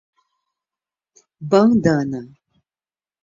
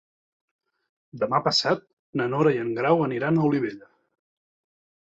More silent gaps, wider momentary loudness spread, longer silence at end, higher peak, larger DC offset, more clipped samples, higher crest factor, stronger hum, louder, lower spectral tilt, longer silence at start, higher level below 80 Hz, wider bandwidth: second, none vs 1.93-2.13 s; first, 17 LU vs 8 LU; second, 0.95 s vs 1.3 s; first, -2 dBFS vs -6 dBFS; neither; neither; about the same, 20 dB vs 20 dB; neither; first, -17 LUFS vs -24 LUFS; first, -7.5 dB/octave vs -5.5 dB/octave; first, 1.4 s vs 1.15 s; first, -56 dBFS vs -68 dBFS; about the same, 7.6 kHz vs 8 kHz